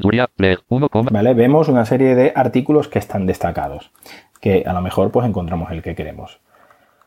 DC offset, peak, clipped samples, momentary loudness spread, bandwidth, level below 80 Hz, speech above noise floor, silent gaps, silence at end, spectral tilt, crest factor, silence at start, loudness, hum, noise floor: under 0.1%; -2 dBFS; under 0.1%; 13 LU; 16 kHz; -42 dBFS; 36 dB; none; 0.8 s; -8 dB/octave; 16 dB; 0 s; -16 LUFS; none; -52 dBFS